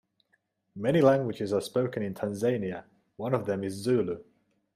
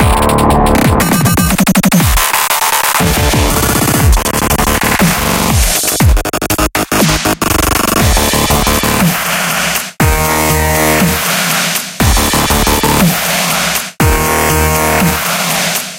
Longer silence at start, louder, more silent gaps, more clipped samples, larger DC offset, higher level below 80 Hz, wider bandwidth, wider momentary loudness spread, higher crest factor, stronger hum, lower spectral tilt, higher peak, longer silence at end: first, 0.75 s vs 0 s; second, -29 LUFS vs -10 LUFS; neither; neither; second, under 0.1% vs 0.3%; second, -68 dBFS vs -18 dBFS; second, 15 kHz vs 17.5 kHz; first, 14 LU vs 3 LU; first, 22 dB vs 10 dB; neither; first, -7 dB/octave vs -3.5 dB/octave; second, -8 dBFS vs 0 dBFS; first, 0.55 s vs 0 s